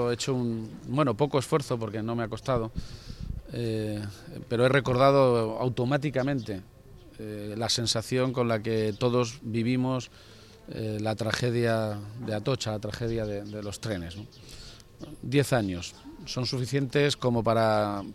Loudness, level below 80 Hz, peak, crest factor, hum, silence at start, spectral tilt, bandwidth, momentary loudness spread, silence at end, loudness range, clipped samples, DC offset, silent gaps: -28 LUFS; -50 dBFS; -8 dBFS; 20 dB; none; 0 s; -5.5 dB/octave; 15 kHz; 17 LU; 0 s; 6 LU; under 0.1%; under 0.1%; none